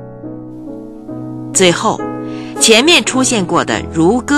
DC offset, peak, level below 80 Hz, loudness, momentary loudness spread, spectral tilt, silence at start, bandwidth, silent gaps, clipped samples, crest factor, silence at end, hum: under 0.1%; 0 dBFS; -42 dBFS; -11 LUFS; 21 LU; -3 dB/octave; 0 s; 16 kHz; none; 0.2%; 14 dB; 0 s; none